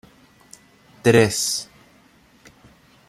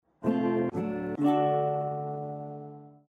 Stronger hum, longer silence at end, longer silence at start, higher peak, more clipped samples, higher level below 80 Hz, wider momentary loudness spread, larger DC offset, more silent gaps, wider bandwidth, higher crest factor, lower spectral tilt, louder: neither; first, 1.45 s vs 0.2 s; first, 1.05 s vs 0.2 s; first, -2 dBFS vs -14 dBFS; neither; first, -56 dBFS vs -66 dBFS; about the same, 13 LU vs 15 LU; neither; neither; first, 14 kHz vs 6.4 kHz; first, 22 dB vs 16 dB; second, -4 dB/octave vs -9 dB/octave; first, -19 LUFS vs -29 LUFS